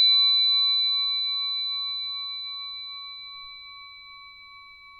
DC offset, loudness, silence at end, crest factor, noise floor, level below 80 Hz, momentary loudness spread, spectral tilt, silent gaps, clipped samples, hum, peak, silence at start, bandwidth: under 0.1%; -22 LUFS; 0 s; 14 dB; -48 dBFS; -70 dBFS; 25 LU; 1 dB/octave; none; under 0.1%; none; -14 dBFS; 0 s; 4.4 kHz